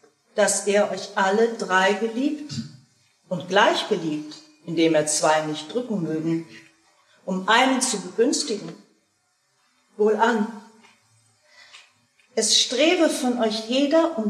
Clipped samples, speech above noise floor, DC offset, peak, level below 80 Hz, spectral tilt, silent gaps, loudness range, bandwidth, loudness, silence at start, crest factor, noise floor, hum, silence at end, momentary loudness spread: under 0.1%; 47 dB; under 0.1%; -4 dBFS; -80 dBFS; -3 dB/octave; none; 4 LU; 14.5 kHz; -22 LUFS; 0.35 s; 20 dB; -68 dBFS; none; 0 s; 14 LU